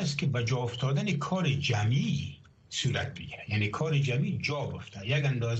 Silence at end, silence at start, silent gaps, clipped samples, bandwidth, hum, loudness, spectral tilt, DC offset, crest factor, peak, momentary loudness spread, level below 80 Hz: 0 s; 0 s; none; under 0.1%; 8.4 kHz; none; -30 LUFS; -5.5 dB/octave; under 0.1%; 14 dB; -16 dBFS; 9 LU; -58 dBFS